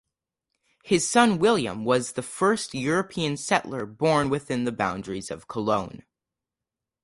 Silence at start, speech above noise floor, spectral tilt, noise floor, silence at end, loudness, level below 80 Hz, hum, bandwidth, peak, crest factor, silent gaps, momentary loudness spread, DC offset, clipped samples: 0.85 s; 64 dB; -4.5 dB/octave; -88 dBFS; 1.05 s; -25 LUFS; -58 dBFS; none; 11.5 kHz; -6 dBFS; 20 dB; none; 13 LU; under 0.1%; under 0.1%